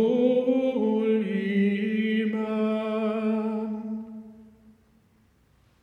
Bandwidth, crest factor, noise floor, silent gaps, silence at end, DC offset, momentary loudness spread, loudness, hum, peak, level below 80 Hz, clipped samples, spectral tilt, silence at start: 5 kHz; 16 dB; -62 dBFS; none; 1.35 s; under 0.1%; 11 LU; -26 LUFS; none; -10 dBFS; -70 dBFS; under 0.1%; -8.5 dB/octave; 0 s